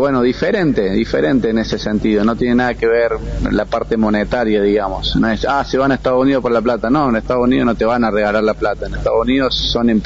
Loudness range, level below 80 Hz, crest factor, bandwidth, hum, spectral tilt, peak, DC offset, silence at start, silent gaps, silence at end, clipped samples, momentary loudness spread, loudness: 1 LU; -30 dBFS; 10 dB; 7.8 kHz; none; -4.5 dB/octave; -4 dBFS; under 0.1%; 0 s; none; 0 s; under 0.1%; 4 LU; -15 LUFS